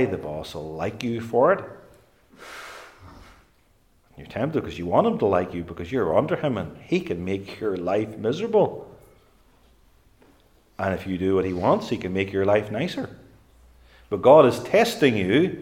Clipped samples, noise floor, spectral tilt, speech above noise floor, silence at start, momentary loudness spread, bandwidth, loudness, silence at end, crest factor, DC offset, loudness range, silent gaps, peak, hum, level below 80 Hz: under 0.1%; -61 dBFS; -6.5 dB/octave; 39 dB; 0 s; 14 LU; 16.5 kHz; -23 LUFS; 0 s; 22 dB; under 0.1%; 7 LU; none; -2 dBFS; none; -56 dBFS